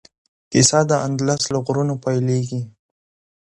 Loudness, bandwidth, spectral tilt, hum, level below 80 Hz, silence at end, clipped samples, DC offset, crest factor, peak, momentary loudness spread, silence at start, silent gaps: -19 LUFS; 11.5 kHz; -4.5 dB/octave; none; -56 dBFS; 0.8 s; under 0.1%; under 0.1%; 20 dB; 0 dBFS; 11 LU; 0.5 s; none